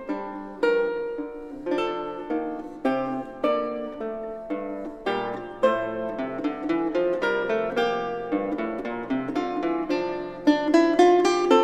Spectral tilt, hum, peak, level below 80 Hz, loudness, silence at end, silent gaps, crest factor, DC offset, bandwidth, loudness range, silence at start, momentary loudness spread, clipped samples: -5 dB/octave; none; -6 dBFS; -54 dBFS; -26 LUFS; 0 s; none; 20 dB; under 0.1%; 9.4 kHz; 5 LU; 0 s; 12 LU; under 0.1%